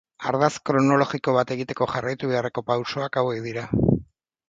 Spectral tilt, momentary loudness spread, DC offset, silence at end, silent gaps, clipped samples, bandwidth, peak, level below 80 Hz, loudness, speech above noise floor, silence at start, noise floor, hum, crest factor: -6.5 dB/octave; 7 LU; under 0.1%; 0.45 s; none; under 0.1%; 8 kHz; -4 dBFS; -46 dBFS; -24 LUFS; 20 dB; 0.2 s; -43 dBFS; none; 20 dB